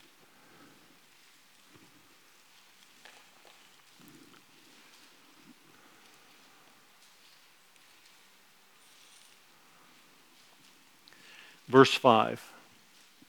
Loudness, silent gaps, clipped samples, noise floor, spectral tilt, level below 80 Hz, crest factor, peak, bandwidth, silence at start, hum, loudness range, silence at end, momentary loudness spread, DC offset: -24 LUFS; none; under 0.1%; -62 dBFS; -5 dB/octave; under -90 dBFS; 30 dB; -4 dBFS; 20 kHz; 11.7 s; none; 29 LU; 0.9 s; 33 LU; under 0.1%